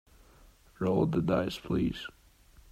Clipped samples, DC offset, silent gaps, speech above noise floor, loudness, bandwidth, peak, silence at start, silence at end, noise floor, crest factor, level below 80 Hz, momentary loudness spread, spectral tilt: under 0.1%; under 0.1%; none; 29 dB; -31 LUFS; 14.5 kHz; -14 dBFS; 0.8 s; 0.6 s; -59 dBFS; 18 dB; -52 dBFS; 10 LU; -7.5 dB/octave